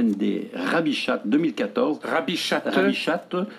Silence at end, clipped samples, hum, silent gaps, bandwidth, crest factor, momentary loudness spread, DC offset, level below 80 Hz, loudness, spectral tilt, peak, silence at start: 0 s; under 0.1%; none; none; 13.5 kHz; 16 dB; 4 LU; under 0.1%; -72 dBFS; -24 LUFS; -5 dB/octave; -8 dBFS; 0 s